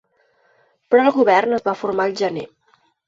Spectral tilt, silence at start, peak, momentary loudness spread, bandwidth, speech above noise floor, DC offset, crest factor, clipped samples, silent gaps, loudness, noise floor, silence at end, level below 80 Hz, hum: -5.5 dB/octave; 0.9 s; -2 dBFS; 11 LU; 7.6 kHz; 44 dB; under 0.1%; 18 dB; under 0.1%; none; -18 LUFS; -61 dBFS; 0.6 s; -66 dBFS; none